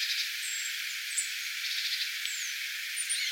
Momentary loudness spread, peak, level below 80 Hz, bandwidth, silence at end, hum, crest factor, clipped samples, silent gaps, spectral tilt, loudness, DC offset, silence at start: 3 LU; -14 dBFS; under -90 dBFS; 17 kHz; 0 s; none; 20 dB; under 0.1%; none; 13 dB/octave; -31 LUFS; under 0.1%; 0 s